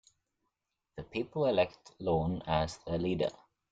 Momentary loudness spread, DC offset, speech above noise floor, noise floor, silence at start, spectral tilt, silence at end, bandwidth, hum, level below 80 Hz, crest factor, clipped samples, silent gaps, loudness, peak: 10 LU; under 0.1%; 53 dB; -85 dBFS; 0.95 s; -6.5 dB/octave; 0.4 s; 9.2 kHz; none; -56 dBFS; 20 dB; under 0.1%; none; -33 LUFS; -14 dBFS